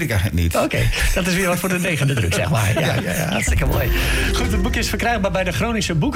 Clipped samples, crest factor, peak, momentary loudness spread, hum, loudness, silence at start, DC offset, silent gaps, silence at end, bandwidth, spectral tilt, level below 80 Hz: under 0.1%; 10 dB; -10 dBFS; 2 LU; none; -19 LUFS; 0 s; under 0.1%; none; 0 s; 16.5 kHz; -4.5 dB/octave; -26 dBFS